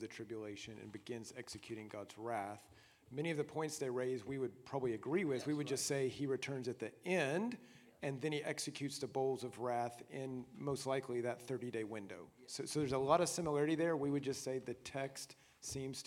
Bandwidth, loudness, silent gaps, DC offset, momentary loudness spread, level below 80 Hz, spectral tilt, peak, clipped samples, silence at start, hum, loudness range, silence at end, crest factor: 16.5 kHz; -41 LUFS; none; under 0.1%; 12 LU; -74 dBFS; -4.5 dB/octave; -18 dBFS; under 0.1%; 0 s; none; 5 LU; 0.05 s; 24 dB